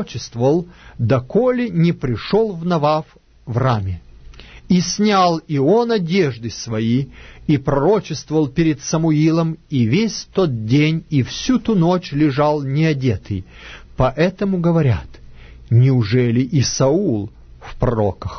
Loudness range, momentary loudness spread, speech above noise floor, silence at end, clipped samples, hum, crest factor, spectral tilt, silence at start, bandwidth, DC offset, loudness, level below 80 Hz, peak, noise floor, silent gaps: 2 LU; 9 LU; 22 dB; 0 s; under 0.1%; none; 16 dB; -6.5 dB/octave; 0 s; 6.6 kHz; under 0.1%; -18 LUFS; -40 dBFS; -2 dBFS; -39 dBFS; none